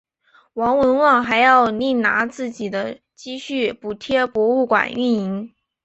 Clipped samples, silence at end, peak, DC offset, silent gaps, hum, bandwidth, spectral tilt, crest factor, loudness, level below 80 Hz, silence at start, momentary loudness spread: under 0.1%; 0.35 s; -2 dBFS; under 0.1%; none; none; 8.2 kHz; -5 dB/octave; 18 dB; -18 LUFS; -56 dBFS; 0.55 s; 16 LU